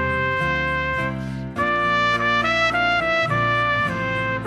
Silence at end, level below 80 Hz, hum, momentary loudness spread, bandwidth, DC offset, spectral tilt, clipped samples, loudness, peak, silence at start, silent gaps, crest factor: 0 s; -42 dBFS; none; 6 LU; 13 kHz; under 0.1%; -5 dB/octave; under 0.1%; -20 LUFS; -8 dBFS; 0 s; none; 14 dB